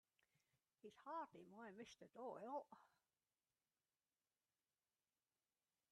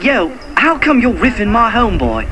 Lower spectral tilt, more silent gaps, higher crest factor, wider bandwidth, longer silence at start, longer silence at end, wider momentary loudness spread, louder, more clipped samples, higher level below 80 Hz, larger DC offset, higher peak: about the same, -5 dB/octave vs -6 dB/octave; neither; first, 20 dB vs 12 dB; second, 8.2 kHz vs 11 kHz; first, 0.85 s vs 0 s; first, 3.05 s vs 0 s; first, 13 LU vs 5 LU; second, -56 LUFS vs -12 LUFS; neither; second, under -90 dBFS vs -24 dBFS; second, under 0.1% vs 2%; second, -40 dBFS vs 0 dBFS